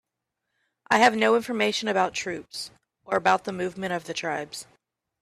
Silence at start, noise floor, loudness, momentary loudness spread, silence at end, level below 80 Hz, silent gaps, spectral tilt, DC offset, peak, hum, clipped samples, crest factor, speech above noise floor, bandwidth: 0.9 s; -83 dBFS; -25 LUFS; 16 LU; 0.6 s; -66 dBFS; none; -3.5 dB/octave; under 0.1%; -4 dBFS; none; under 0.1%; 22 dB; 58 dB; 14 kHz